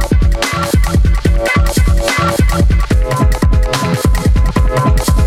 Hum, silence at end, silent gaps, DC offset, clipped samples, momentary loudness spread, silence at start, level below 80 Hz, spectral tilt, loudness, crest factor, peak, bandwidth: none; 0 s; none; under 0.1%; under 0.1%; 2 LU; 0 s; -14 dBFS; -5.5 dB/octave; -13 LUFS; 10 dB; 0 dBFS; 15.5 kHz